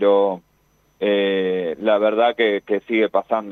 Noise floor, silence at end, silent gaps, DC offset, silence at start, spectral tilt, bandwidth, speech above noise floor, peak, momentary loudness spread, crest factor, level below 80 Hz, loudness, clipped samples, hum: -61 dBFS; 0 s; none; under 0.1%; 0 s; -7 dB/octave; 4.2 kHz; 42 dB; -4 dBFS; 6 LU; 14 dB; -66 dBFS; -19 LUFS; under 0.1%; 50 Hz at -65 dBFS